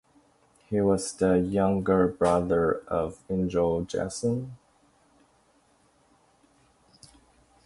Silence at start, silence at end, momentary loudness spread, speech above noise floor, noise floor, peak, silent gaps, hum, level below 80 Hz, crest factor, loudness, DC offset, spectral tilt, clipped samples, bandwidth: 0.7 s; 3.1 s; 8 LU; 39 dB; -64 dBFS; -8 dBFS; none; none; -50 dBFS; 20 dB; -26 LUFS; under 0.1%; -6.5 dB/octave; under 0.1%; 11.5 kHz